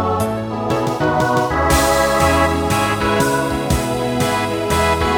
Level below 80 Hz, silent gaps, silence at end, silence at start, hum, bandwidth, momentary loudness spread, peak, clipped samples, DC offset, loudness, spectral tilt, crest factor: -30 dBFS; none; 0 s; 0 s; none; 19 kHz; 5 LU; -2 dBFS; under 0.1%; under 0.1%; -17 LUFS; -4.5 dB/octave; 14 dB